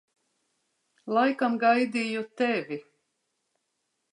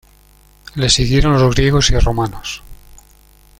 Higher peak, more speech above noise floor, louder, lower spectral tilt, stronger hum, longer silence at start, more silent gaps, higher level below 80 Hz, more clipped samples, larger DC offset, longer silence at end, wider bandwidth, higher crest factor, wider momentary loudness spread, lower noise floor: second, -10 dBFS vs 0 dBFS; first, 53 dB vs 35 dB; second, -26 LUFS vs -14 LUFS; about the same, -5 dB/octave vs -4.5 dB/octave; neither; first, 1.05 s vs 0.75 s; neither; second, -84 dBFS vs -24 dBFS; neither; neither; first, 1.3 s vs 0.85 s; second, 10 kHz vs 16 kHz; about the same, 18 dB vs 16 dB; about the same, 15 LU vs 15 LU; first, -79 dBFS vs -48 dBFS